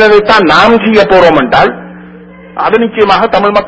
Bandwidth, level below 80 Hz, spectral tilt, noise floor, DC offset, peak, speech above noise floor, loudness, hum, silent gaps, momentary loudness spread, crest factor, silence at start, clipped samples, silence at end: 8 kHz; -36 dBFS; -5.5 dB/octave; -31 dBFS; under 0.1%; 0 dBFS; 25 dB; -6 LUFS; none; none; 8 LU; 8 dB; 0 s; 3%; 0 s